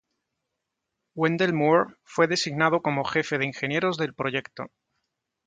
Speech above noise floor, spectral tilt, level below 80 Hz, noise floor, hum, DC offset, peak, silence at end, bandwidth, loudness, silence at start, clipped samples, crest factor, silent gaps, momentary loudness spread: 58 dB; -5 dB/octave; -68 dBFS; -83 dBFS; none; under 0.1%; -6 dBFS; 0.8 s; 9.4 kHz; -25 LUFS; 1.15 s; under 0.1%; 20 dB; none; 11 LU